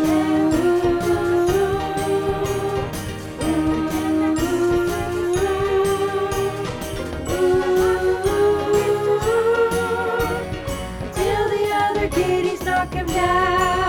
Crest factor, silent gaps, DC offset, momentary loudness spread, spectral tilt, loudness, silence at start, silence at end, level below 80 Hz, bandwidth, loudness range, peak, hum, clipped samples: 14 dB; none; under 0.1%; 8 LU; -5.5 dB/octave; -20 LUFS; 0 s; 0 s; -36 dBFS; 19.5 kHz; 2 LU; -6 dBFS; none; under 0.1%